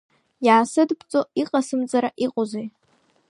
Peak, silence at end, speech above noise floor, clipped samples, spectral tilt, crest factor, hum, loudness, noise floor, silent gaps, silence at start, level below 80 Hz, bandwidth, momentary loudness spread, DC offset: -4 dBFS; 0.6 s; 42 dB; under 0.1%; -4.5 dB/octave; 18 dB; none; -22 LUFS; -63 dBFS; none; 0.4 s; -76 dBFS; 11.5 kHz; 10 LU; under 0.1%